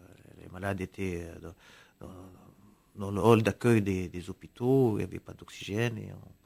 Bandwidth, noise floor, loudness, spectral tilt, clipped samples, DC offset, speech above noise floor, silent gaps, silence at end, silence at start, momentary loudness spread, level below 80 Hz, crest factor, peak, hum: 16 kHz; -52 dBFS; -29 LUFS; -7 dB/octave; under 0.1%; under 0.1%; 22 dB; none; 0.25 s; 0.35 s; 24 LU; -54 dBFS; 22 dB; -8 dBFS; none